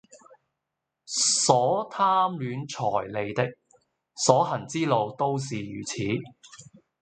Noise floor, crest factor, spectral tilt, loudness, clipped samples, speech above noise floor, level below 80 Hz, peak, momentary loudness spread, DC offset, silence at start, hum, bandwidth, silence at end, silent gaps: -84 dBFS; 24 dB; -3.5 dB/octave; -25 LUFS; under 0.1%; 58 dB; -66 dBFS; -2 dBFS; 12 LU; under 0.1%; 0.15 s; none; 9.6 kHz; 0.4 s; none